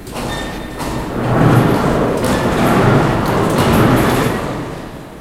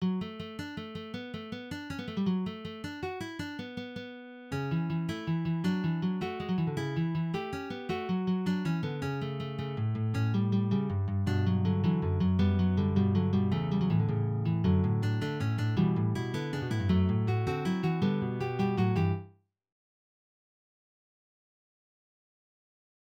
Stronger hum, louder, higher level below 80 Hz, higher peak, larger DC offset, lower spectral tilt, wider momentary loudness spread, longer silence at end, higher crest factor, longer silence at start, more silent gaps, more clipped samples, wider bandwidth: neither; first, -14 LUFS vs -31 LUFS; first, -30 dBFS vs -56 dBFS; first, 0 dBFS vs -14 dBFS; neither; second, -6.5 dB/octave vs -8 dB/octave; about the same, 13 LU vs 12 LU; second, 0 s vs 3.8 s; about the same, 14 dB vs 16 dB; about the same, 0 s vs 0 s; neither; neither; first, 16.5 kHz vs 9 kHz